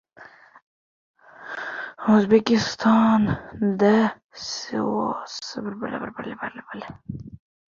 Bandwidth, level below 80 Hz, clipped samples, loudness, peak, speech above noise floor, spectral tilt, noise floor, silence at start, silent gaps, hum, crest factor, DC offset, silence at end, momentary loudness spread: 7.4 kHz; -56 dBFS; under 0.1%; -23 LUFS; -4 dBFS; 27 dB; -6 dB/octave; -49 dBFS; 0.2 s; 0.62-1.14 s, 4.24-4.29 s; none; 20 dB; under 0.1%; 0.45 s; 19 LU